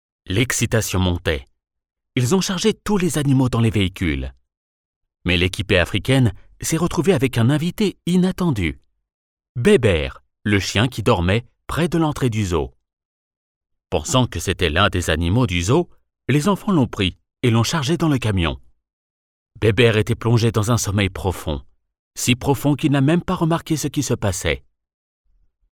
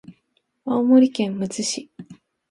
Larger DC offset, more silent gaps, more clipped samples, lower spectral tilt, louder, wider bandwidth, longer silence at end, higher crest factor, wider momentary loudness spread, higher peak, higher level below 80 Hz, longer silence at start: neither; first, 4.57-5.01 s, 9.14-9.37 s, 9.49-9.55 s, 13.05-13.31 s, 13.37-13.61 s, 18.93-19.46 s, 21.99-22.11 s vs none; neither; about the same, -5.5 dB/octave vs -5 dB/octave; about the same, -19 LUFS vs -20 LUFS; first, 19 kHz vs 11.5 kHz; first, 1.15 s vs 0.4 s; about the same, 16 dB vs 18 dB; second, 8 LU vs 18 LU; about the same, -4 dBFS vs -4 dBFS; first, -38 dBFS vs -68 dBFS; first, 0.25 s vs 0.1 s